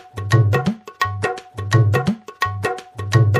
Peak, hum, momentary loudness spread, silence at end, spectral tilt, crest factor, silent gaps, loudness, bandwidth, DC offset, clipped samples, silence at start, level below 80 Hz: -2 dBFS; none; 9 LU; 0 s; -6.5 dB/octave; 16 dB; none; -20 LUFS; 15 kHz; under 0.1%; under 0.1%; 0.15 s; -46 dBFS